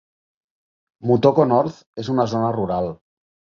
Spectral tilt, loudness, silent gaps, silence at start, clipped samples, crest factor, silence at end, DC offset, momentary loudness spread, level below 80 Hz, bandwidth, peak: -8 dB/octave; -20 LUFS; 1.86-1.93 s; 1 s; under 0.1%; 20 dB; 0.55 s; under 0.1%; 13 LU; -54 dBFS; 7.2 kHz; -2 dBFS